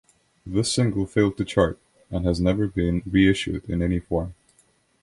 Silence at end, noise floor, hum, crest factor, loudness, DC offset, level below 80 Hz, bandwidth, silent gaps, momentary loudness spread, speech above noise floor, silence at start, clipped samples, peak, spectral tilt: 0.7 s; -63 dBFS; none; 18 dB; -23 LUFS; under 0.1%; -38 dBFS; 11.5 kHz; none; 9 LU; 40 dB; 0.45 s; under 0.1%; -6 dBFS; -6 dB/octave